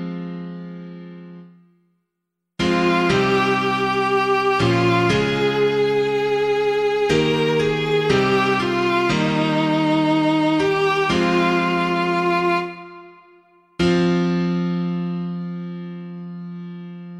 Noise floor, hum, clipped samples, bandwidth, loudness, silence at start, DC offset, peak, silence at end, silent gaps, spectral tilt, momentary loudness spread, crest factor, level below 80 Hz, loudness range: -79 dBFS; none; under 0.1%; 12.5 kHz; -19 LUFS; 0 s; under 0.1%; -6 dBFS; 0 s; none; -6 dB/octave; 16 LU; 14 dB; -48 dBFS; 5 LU